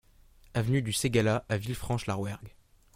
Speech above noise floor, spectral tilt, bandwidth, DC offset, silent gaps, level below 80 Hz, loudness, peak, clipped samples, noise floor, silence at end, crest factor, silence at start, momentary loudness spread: 29 dB; -5.5 dB/octave; 16.5 kHz; under 0.1%; none; -52 dBFS; -30 LUFS; -10 dBFS; under 0.1%; -58 dBFS; 0.45 s; 20 dB; 0.55 s; 9 LU